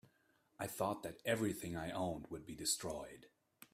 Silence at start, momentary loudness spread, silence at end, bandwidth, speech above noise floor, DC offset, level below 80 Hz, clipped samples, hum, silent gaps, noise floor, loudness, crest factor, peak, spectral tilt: 0.6 s; 11 LU; 0.1 s; 16 kHz; 35 dB; under 0.1%; -68 dBFS; under 0.1%; none; none; -76 dBFS; -42 LUFS; 20 dB; -24 dBFS; -3.5 dB/octave